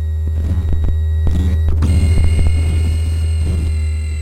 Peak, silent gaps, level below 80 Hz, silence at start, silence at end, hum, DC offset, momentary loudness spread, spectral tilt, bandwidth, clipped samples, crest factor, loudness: -4 dBFS; none; -16 dBFS; 0 s; 0 s; none; under 0.1%; 4 LU; -7 dB/octave; 9.6 kHz; under 0.1%; 10 dB; -17 LUFS